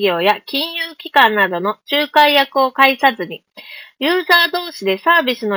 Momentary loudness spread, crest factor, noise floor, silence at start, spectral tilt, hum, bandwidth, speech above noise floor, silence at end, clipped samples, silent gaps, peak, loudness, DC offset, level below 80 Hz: 15 LU; 16 dB; -37 dBFS; 0 s; -3.5 dB/octave; none; over 20 kHz; 22 dB; 0 s; under 0.1%; none; 0 dBFS; -14 LUFS; under 0.1%; -66 dBFS